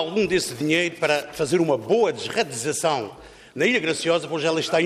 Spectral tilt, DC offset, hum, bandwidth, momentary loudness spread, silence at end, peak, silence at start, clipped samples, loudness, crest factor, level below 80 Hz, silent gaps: -4 dB/octave; under 0.1%; none; 15.5 kHz; 4 LU; 0 s; -8 dBFS; 0 s; under 0.1%; -22 LUFS; 14 dB; -58 dBFS; none